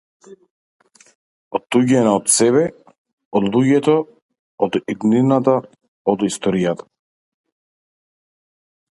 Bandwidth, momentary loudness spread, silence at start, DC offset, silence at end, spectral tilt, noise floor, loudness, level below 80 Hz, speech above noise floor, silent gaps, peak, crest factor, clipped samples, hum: 11.5 kHz; 10 LU; 0.3 s; under 0.1%; 2.15 s; -5 dB/octave; under -90 dBFS; -17 LUFS; -60 dBFS; over 74 dB; 0.50-0.80 s, 1.15-1.51 s, 2.98-3.05 s, 3.13-3.18 s, 3.25-3.31 s, 4.22-4.29 s, 4.39-4.58 s, 5.88-6.05 s; 0 dBFS; 18 dB; under 0.1%; none